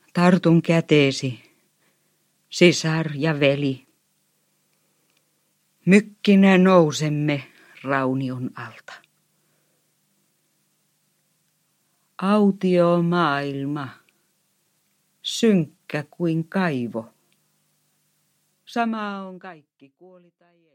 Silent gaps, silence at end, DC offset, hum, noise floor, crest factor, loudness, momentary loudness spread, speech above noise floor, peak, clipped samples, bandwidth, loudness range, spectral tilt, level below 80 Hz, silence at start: none; 1.2 s; under 0.1%; 50 Hz at -50 dBFS; -68 dBFS; 20 dB; -20 LUFS; 18 LU; 48 dB; -2 dBFS; under 0.1%; 11 kHz; 11 LU; -6 dB/octave; -70 dBFS; 0.15 s